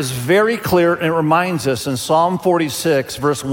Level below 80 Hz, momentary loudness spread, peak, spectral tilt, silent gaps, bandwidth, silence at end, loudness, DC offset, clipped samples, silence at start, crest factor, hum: -50 dBFS; 5 LU; -2 dBFS; -5 dB/octave; none; 17 kHz; 0 s; -16 LUFS; under 0.1%; under 0.1%; 0 s; 14 dB; none